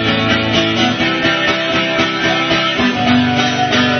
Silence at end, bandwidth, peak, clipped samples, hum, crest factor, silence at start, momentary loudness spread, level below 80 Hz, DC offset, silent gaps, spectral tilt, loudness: 0 s; 6.6 kHz; 0 dBFS; under 0.1%; none; 14 dB; 0 s; 2 LU; -42 dBFS; under 0.1%; none; -4.5 dB/octave; -13 LUFS